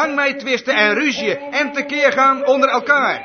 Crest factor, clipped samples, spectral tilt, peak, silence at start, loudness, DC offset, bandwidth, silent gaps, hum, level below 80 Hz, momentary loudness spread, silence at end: 16 dB; under 0.1%; -3 dB/octave; 0 dBFS; 0 s; -16 LUFS; under 0.1%; 6.6 kHz; none; none; -64 dBFS; 6 LU; 0 s